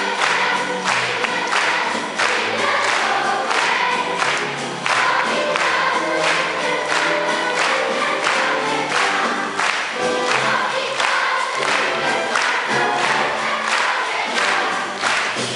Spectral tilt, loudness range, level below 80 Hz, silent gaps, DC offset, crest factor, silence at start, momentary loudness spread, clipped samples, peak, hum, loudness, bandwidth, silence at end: -1.5 dB/octave; 1 LU; -68 dBFS; none; under 0.1%; 16 dB; 0 s; 3 LU; under 0.1%; -2 dBFS; none; -18 LUFS; 11.5 kHz; 0 s